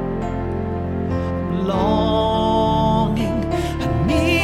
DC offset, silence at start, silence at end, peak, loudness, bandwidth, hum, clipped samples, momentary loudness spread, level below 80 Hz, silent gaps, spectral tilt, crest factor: under 0.1%; 0 s; 0 s; -4 dBFS; -20 LUFS; 14 kHz; none; under 0.1%; 7 LU; -30 dBFS; none; -7 dB/octave; 14 dB